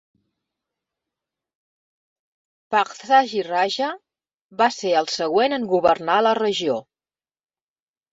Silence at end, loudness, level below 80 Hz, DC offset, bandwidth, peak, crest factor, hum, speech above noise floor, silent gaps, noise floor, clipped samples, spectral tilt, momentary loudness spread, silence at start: 1.3 s; -20 LUFS; -66 dBFS; under 0.1%; 7.8 kHz; -4 dBFS; 20 dB; none; over 70 dB; 4.41-4.49 s; under -90 dBFS; under 0.1%; -3.5 dB/octave; 8 LU; 2.7 s